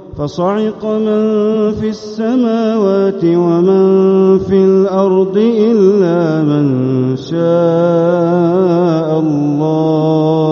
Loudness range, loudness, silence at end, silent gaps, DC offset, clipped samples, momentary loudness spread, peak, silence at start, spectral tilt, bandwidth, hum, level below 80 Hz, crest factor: 3 LU; -12 LUFS; 0 s; none; under 0.1%; under 0.1%; 6 LU; 0 dBFS; 0 s; -8 dB/octave; 6.8 kHz; none; -48 dBFS; 10 dB